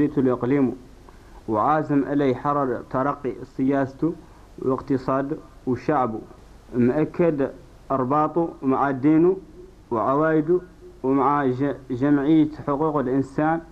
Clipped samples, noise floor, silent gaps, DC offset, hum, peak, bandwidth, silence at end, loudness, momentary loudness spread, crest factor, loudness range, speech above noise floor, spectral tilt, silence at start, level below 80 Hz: under 0.1%; -45 dBFS; none; under 0.1%; none; -8 dBFS; 8 kHz; 0.05 s; -23 LUFS; 9 LU; 16 dB; 4 LU; 24 dB; -9.5 dB/octave; 0 s; -50 dBFS